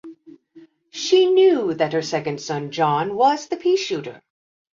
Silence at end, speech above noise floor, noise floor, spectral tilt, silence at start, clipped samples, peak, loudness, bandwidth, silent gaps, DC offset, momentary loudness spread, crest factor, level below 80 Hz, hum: 0.6 s; 31 dB; -50 dBFS; -5 dB/octave; 0.05 s; under 0.1%; -6 dBFS; -20 LUFS; 7.6 kHz; none; under 0.1%; 12 LU; 16 dB; -68 dBFS; none